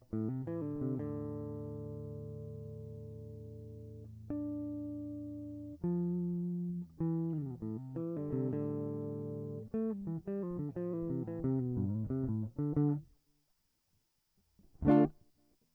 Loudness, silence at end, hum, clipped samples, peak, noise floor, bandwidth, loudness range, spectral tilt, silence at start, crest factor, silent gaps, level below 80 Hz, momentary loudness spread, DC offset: -38 LUFS; 0.6 s; none; under 0.1%; -16 dBFS; -78 dBFS; 4.1 kHz; 9 LU; -11.5 dB/octave; 0.1 s; 22 dB; none; -60 dBFS; 13 LU; under 0.1%